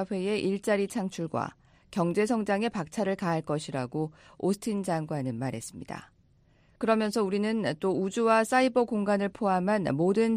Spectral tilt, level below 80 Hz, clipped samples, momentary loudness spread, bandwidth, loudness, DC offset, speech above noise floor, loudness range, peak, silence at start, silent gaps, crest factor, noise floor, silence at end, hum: -6 dB/octave; -64 dBFS; under 0.1%; 10 LU; 15.5 kHz; -29 LUFS; under 0.1%; 35 dB; 6 LU; -10 dBFS; 0 s; none; 20 dB; -63 dBFS; 0 s; none